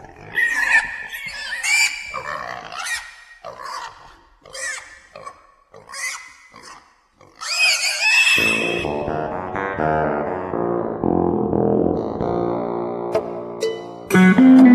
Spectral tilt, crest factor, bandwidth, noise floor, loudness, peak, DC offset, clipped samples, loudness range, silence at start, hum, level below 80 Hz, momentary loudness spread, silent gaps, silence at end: -4 dB/octave; 18 dB; 14 kHz; -52 dBFS; -19 LUFS; -2 dBFS; under 0.1%; under 0.1%; 14 LU; 0 s; none; -48 dBFS; 19 LU; none; 0 s